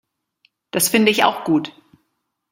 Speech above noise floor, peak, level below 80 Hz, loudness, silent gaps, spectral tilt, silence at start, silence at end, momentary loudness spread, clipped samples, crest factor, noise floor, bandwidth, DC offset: 56 dB; 0 dBFS; -64 dBFS; -17 LUFS; none; -3 dB/octave; 0.75 s; 0.8 s; 11 LU; under 0.1%; 20 dB; -73 dBFS; 16.5 kHz; under 0.1%